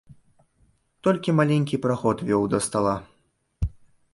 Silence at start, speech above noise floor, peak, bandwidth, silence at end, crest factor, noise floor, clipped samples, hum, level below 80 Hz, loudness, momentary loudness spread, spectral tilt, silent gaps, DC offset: 0.1 s; 45 dB; -6 dBFS; 11.5 kHz; 0.45 s; 18 dB; -67 dBFS; under 0.1%; none; -42 dBFS; -24 LUFS; 11 LU; -6 dB/octave; none; under 0.1%